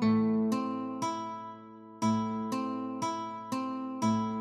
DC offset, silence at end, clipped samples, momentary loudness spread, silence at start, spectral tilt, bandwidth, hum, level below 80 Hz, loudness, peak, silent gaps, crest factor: under 0.1%; 0 s; under 0.1%; 11 LU; 0 s; -6 dB/octave; 13.5 kHz; none; -72 dBFS; -33 LUFS; -18 dBFS; none; 14 dB